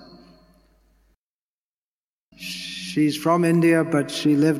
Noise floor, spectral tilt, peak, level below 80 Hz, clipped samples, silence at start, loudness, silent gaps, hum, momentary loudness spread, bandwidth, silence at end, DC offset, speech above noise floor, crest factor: under -90 dBFS; -6 dB/octave; -6 dBFS; -62 dBFS; under 0.1%; 2.4 s; -21 LUFS; none; none; 14 LU; 15 kHz; 0 s; under 0.1%; over 71 dB; 16 dB